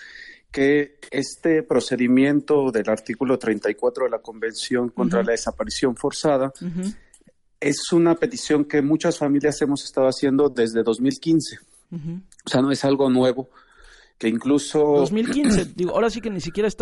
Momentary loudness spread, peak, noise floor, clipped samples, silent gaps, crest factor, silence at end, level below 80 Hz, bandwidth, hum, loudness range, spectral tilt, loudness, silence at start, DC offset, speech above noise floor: 10 LU; -8 dBFS; -56 dBFS; under 0.1%; none; 14 dB; 0.05 s; -48 dBFS; 11.5 kHz; none; 3 LU; -5.5 dB/octave; -21 LUFS; 0 s; under 0.1%; 35 dB